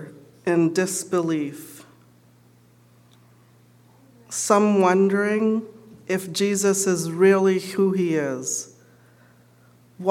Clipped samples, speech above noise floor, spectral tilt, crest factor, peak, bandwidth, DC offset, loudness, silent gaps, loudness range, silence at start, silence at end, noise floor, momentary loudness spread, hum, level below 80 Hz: under 0.1%; 34 dB; -5 dB/octave; 20 dB; -2 dBFS; 16.5 kHz; under 0.1%; -22 LUFS; none; 9 LU; 0 s; 0 s; -55 dBFS; 14 LU; 60 Hz at -55 dBFS; -74 dBFS